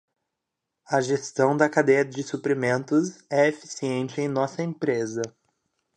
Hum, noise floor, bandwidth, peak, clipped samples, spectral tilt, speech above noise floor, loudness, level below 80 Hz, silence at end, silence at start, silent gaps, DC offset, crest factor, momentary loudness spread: none; -83 dBFS; 9.8 kHz; -6 dBFS; under 0.1%; -5.5 dB/octave; 59 dB; -25 LUFS; -74 dBFS; 0.65 s; 0.9 s; none; under 0.1%; 20 dB; 9 LU